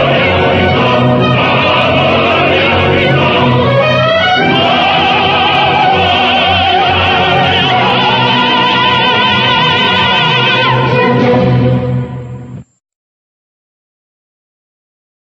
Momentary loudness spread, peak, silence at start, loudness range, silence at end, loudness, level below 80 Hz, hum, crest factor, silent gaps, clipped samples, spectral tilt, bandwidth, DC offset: 1 LU; 0 dBFS; 0 s; 5 LU; 2.65 s; -9 LUFS; -38 dBFS; none; 10 dB; none; under 0.1%; -6 dB/octave; 7.8 kHz; under 0.1%